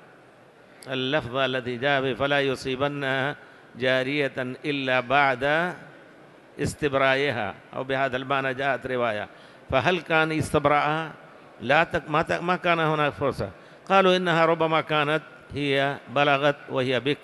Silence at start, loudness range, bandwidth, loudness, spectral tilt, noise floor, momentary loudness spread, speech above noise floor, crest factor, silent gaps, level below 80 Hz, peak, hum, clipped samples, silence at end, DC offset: 0.85 s; 3 LU; 12.5 kHz; -24 LUFS; -5.5 dB/octave; -52 dBFS; 10 LU; 28 dB; 20 dB; none; -54 dBFS; -4 dBFS; none; under 0.1%; 0 s; under 0.1%